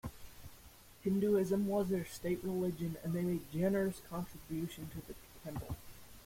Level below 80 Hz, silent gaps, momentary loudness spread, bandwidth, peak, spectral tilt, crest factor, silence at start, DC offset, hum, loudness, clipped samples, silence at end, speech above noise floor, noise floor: -60 dBFS; none; 21 LU; 16.5 kHz; -22 dBFS; -7 dB/octave; 16 dB; 0.05 s; under 0.1%; none; -37 LUFS; under 0.1%; 0 s; 22 dB; -58 dBFS